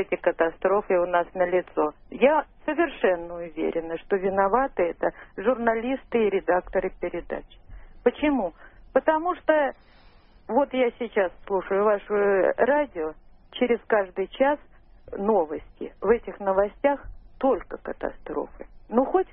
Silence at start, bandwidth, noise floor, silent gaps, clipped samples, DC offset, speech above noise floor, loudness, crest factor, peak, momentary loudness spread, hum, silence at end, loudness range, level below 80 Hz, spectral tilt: 0 s; 3.8 kHz; -53 dBFS; none; under 0.1%; under 0.1%; 28 dB; -25 LUFS; 20 dB; -6 dBFS; 11 LU; none; 0.05 s; 2 LU; -50 dBFS; -10 dB/octave